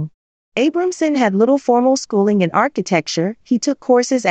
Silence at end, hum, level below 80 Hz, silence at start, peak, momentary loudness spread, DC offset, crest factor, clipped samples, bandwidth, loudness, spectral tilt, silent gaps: 0 s; none; -64 dBFS; 0 s; -2 dBFS; 6 LU; under 0.1%; 14 dB; under 0.1%; 8.8 kHz; -16 LUFS; -5 dB/octave; 0.14-0.52 s